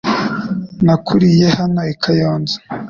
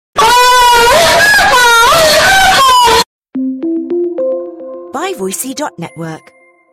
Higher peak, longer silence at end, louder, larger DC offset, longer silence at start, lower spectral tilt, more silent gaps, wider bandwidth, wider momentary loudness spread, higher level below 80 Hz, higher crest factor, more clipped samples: about the same, -2 dBFS vs 0 dBFS; second, 0 s vs 0.55 s; second, -15 LUFS vs -7 LUFS; neither; about the same, 0.05 s vs 0.15 s; first, -7 dB/octave vs -1.5 dB/octave; second, none vs 3.06-3.22 s; second, 7.2 kHz vs 16 kHz; second, 10 LU vs 18 LU; second, -46 dBFS vs -36 dBFS; about the same, 12 dB vs 10 dB; neither